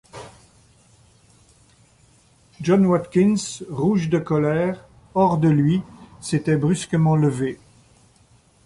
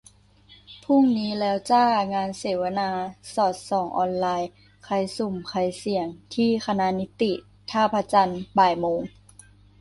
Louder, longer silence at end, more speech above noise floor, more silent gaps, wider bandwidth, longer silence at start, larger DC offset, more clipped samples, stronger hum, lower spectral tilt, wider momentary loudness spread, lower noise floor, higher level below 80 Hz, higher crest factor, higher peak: first, -20 LUFS vs -24 LUFS; first, 1.1 s vs 0.7 s; first, 37 dB vs 31 dB; neither; about the same, 11.5 kHz vs 11.5 kHz; second, 0.15 s vs 0.7 s; neither; neither; second, none vs 50 Hz at -50 dBFS; first, -7 dB/octave vs -5.5 dB/octave; first, 15 LU vs 9 LU; about the same, -56 dBFS vs -54 dBFS; about the same, -54 dBFS vs -58 dBFS; about the same, 18 dB vs 18 dB; about the same, -4 dBFS vs -6 dBFS